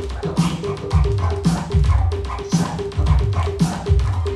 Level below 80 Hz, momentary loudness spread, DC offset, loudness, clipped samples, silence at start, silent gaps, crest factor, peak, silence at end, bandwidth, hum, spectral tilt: -24 dBFS; 4 LU; under 0.1%; -20 LUFS; under 0.1%; 0 s; none; 14 dB; -4 dBFS; 0 s; 12 kHz; none; -7 dB/octave